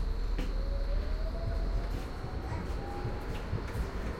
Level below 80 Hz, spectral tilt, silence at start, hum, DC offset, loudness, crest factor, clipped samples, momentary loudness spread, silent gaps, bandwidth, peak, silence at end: -34 dBFS; -7 dB/octave; 0 s; none; under 0.1%; -37 LUFS; 12 dB; under 0.1%; 3 LU; none; 12.5 kHz; -22 dBFS; 0 s